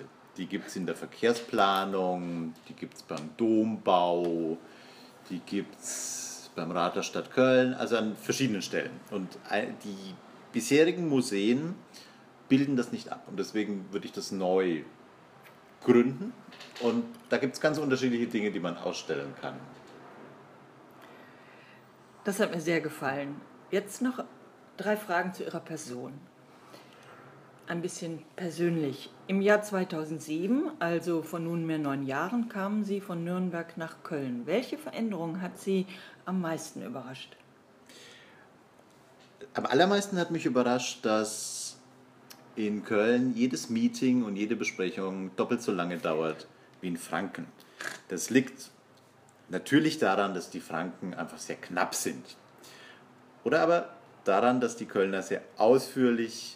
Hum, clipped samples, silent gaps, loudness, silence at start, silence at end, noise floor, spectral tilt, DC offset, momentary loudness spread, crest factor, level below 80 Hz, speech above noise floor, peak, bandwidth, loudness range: none; under 0.1%; none; -30 LUFS; 0 s; 0 s; -59 dBFS; -5 dB/octave; under 0.1%; 18 LU; 22 dB; -80 dBFS; 29 dB; -8 dBFS; 15.5 kHz; 7 LU